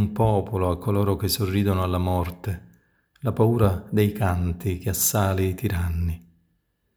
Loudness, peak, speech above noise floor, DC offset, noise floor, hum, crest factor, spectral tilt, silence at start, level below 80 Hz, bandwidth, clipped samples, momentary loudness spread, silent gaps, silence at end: -24 LUFS; -6 dBFS; 48 dB; under 0.1%; -71 dBFS; none; 18 dB; -6 dB/octave; 0 s; -44 dBFS; over 20 kHz; under 0.1%; 10 LU; none; 0.75 s